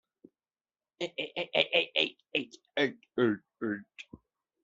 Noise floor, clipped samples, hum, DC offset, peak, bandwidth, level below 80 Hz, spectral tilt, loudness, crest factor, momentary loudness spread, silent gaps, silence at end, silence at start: under -90 dBFS; under 0.1%; none; under 0.1%; -8 dBFS; 7.8 kHz; -78 dBFS; -1.5 dB/octave; -31 LUFS; 26 dB; 13 LU; none; 0.45 s; 1 s